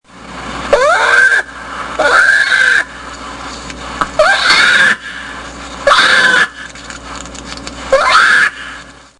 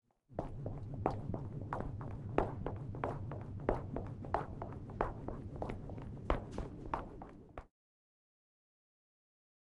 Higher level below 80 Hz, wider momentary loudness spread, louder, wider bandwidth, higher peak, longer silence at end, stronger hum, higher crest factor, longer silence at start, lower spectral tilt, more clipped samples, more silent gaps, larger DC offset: first, -38 dBFS vs -50 dBFS; first, 20 LU vs 8 LU; first, -9 LUFS vs -43 LUFS; first, 12 kHz vs 10.5 kHz; first, 0 dBFS vs -14 dBFS; second, 0.3 s vs 2.05 s; neither; second, 12 dB vs 28 dB; second, 0.15 s vs 0.3 s; second, -1 dB/octave vs -8.5 dB/octave; first, 0.1% vs under 0.1%; neither; neither